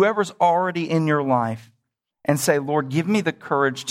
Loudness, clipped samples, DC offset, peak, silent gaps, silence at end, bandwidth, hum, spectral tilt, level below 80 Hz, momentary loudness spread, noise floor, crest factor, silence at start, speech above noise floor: -21 LUFS; under 0.1%; under 0.1%; -4 dBFS; none; 0 s; 16.5 kHz; none; -5.5 dB/octave; -66 dBFS; 5 LU; -74 dBFS; 18 dB; 0 s; 54 dB